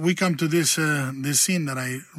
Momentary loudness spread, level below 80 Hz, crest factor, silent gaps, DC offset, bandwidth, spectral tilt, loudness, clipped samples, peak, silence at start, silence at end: 6 LU; -66 dBFS; 16 dB; none; under 0.1%; 16 kHz; -3.5 dB/octave; -22 LUFS; under 0.1%; -8 dBFS; 0 s; 0 s